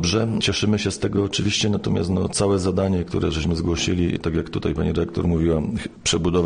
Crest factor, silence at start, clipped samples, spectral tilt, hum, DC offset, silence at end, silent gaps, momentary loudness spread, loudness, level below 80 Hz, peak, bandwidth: 14 dB; 0 s; under 0.1%; -5 dB/octave; none; under 0.1%; 0 s; none; 4 LU; -22 LUFS; -36 dBFS; -6 dBFS; 10 kHz